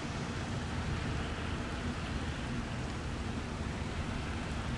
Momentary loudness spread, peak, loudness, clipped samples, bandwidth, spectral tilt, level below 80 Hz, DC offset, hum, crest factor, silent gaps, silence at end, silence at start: 2 LU; -24 dBFS; -38 LUFS; under 0.1%; 11.5 kHz; -5.5 dB/octave; -44 dBFS; under 0.1%; none; 12 dB; none; 0 s; 0 s